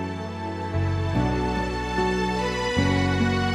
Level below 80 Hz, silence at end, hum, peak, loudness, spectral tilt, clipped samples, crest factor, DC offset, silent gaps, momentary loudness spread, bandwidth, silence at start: -36 dBFS; 0 s; none; -10 dBFS; -25 LUFS; -6 dB/octave; under 0.1%; 14 dB; under 0.1%; none; 9 LU; 11.5 kHz; 0 s